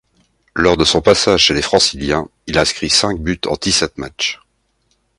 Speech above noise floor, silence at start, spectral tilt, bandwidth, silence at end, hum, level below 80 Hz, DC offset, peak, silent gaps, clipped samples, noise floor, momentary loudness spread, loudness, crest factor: 48 dB; 0.55 s; -3 dB/octave; 11.5 kHz; 0.85 s; none; -36 dBFS; under 0.1%; 0 dBFS; none; under 0.1%; -63 dBFS; 9 LU; -14 LUFS; 16 dB